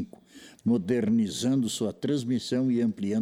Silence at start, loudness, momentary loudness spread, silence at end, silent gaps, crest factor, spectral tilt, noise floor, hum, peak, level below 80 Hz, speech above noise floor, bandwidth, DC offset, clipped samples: 0 s; -27 LUFS; 4 LU; 0 s; none; 14 dB; -6 dB/octave; -51 dBFS; none; -14 dBFS; -66 dBFS; 25 dB; 15 kHz; under 0.1%; under 0.1%